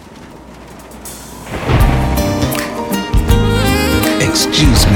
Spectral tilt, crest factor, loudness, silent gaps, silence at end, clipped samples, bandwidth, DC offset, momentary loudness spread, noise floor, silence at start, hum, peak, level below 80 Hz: -4.5 dB/octave; 14 dB; -13 LUFS; none; 0 s; under 0.1%; 19.5 kHz; under 0.1%; 23 LU; -34 dBFS; 0 s; none; 0 dBFS; -20 dBFS